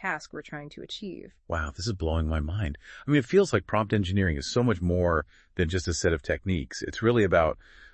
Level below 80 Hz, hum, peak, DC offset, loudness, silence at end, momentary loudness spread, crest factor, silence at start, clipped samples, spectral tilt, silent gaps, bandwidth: -42 dBFS; none; -8 dBFS; under 0.1%; -27 LUFS; 0.1 s; 15 LU; 18 dB; 0 s; under 0.1%; -6 dB/octave; none; 8.8 kHz